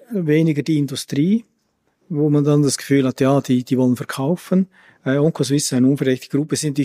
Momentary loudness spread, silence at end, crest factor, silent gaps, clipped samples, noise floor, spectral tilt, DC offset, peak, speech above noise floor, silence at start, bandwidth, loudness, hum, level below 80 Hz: 6 LU; 0 s; 14 dB; none; under 0.1%; -67 dBFS; -6 dB/octave; under 0.1%; -4 dBFS; 49 dB; 0.1 s; 15.5 kHz; -19 LUFS; none; -62 dBFS